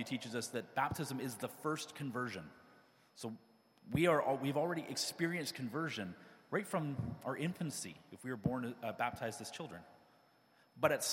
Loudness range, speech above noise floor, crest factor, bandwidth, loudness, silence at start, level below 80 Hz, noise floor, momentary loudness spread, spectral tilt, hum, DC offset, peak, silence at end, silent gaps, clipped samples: 5 LU; 31 dB; 26 dB; 16.5 kHz; -40 LUFS; 0 s; -70 dBFS; -70 dBFS; 14 LU; -4.5 dB/octave; none; under 0.1%; -14 dBFS; 0 s; none; under 0.1%